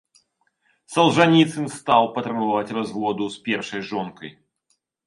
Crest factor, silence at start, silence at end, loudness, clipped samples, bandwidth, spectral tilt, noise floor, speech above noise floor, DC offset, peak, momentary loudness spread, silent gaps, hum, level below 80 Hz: 22 dB; 0.9 s; 0.75 s; -21 LUFS; under 0.1%; 11.5 kHz; -5.5 dB/octave; -71 dBFS; 50 dB; under 0.1%; 0 dBFS; 13 LU; none; none; -64 dBFS